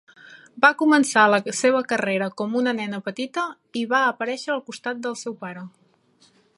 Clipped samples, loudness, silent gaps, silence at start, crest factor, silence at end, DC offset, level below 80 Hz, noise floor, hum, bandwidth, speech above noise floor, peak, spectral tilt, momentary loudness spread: under 0.1%; -22 LUFS; none; 0.3 s; 22 dB; 0.9 s; under 0.1%; -76 dBFS; -60 dBFS; none; 11.5 kHz; 38 dB; -2 dBFS; -3.5 dB/octave; 14 LU